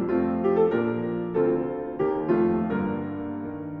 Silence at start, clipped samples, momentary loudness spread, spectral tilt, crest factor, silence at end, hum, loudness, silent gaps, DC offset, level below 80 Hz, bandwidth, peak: 0 s; under 0.1%; 10 LU; -11 dB/octave; 14 dB; 0 s; none; -26 LUFS; none; under 0.1%; -54 dBFS; 4.2 kHz; -10 dBFS